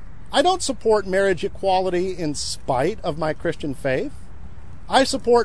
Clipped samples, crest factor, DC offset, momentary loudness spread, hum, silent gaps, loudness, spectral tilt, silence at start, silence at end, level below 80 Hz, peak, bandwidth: under 0.1%; 18 dB; 3%; 7 LU; none; none; -22 LUFS; -4 dB/octave; 0 s; 0 s; -42 dBFS; -4 dBFS; 11 kHz